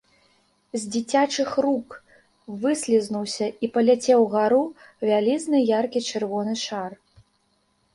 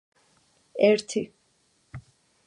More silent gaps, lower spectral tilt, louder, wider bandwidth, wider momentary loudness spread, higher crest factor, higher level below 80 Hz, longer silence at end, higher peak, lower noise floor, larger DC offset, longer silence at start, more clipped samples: neither; about the same, -4.5 dB/octave vs -4.5 dB/octave; about the same, -23 LUFS vs -24 LUFS; about the same, 11.5 kHz vs 11 kHz; second, 13 LU vs 25 LU; second, 16 dB vs 22 dB; about the same, -68 dBFS vs -64 dBFS; first, 1 s vs 0.45 s; about the same, -6 dBFS vs -8 dBFS; about the same, -68 dBFS vs -68 dBFS; neither; about the same, 0.75 s vs 0.75 s; neither